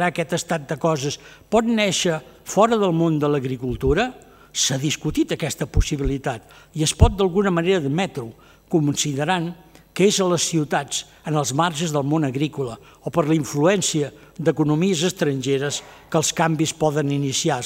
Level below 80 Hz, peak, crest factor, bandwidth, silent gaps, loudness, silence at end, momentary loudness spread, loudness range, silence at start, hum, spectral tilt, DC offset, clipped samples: -34 dBFS; 0 dBFS; 20 dB; 16 kHz; none; -21 LUFS; 0 s; 9 LU; 2 LU; 0 s; none; -4.5 dB/octave; under 0.1%; under 0.1%